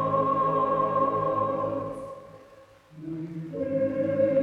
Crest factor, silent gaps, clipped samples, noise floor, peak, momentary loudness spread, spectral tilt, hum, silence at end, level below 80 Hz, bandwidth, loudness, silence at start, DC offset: 14 dB; none; under 0.1%; -53 dBFS; -12 dBFS; 15 LU; -9 dB/octave; none; 0 s; -60 dBFS; 5.4 kHz; -27 LUFS; 0 s; under 0.1%